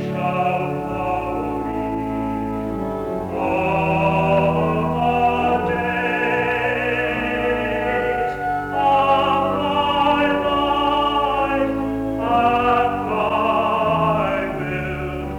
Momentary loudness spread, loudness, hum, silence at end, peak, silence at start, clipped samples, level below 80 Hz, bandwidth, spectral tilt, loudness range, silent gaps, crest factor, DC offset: 7 LU; -20 LUFS; none; 0 s; -6 dBFS; 0 s; under 0.1%; -40 dBFS; over 20 kHz; -7 dB/octave; 4 LU; none; 14 dB; under 0.1%